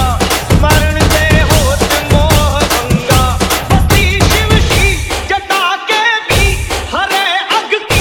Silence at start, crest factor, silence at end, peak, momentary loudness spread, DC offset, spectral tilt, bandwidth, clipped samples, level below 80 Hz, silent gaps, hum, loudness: 0 s; 10 dB; 0 s; 0 dBFS; 4 LU; under 0.1%; -4 dB/octave; over 20 kHz; 0.1%; -18 dBFS; none; none; -11 LUFS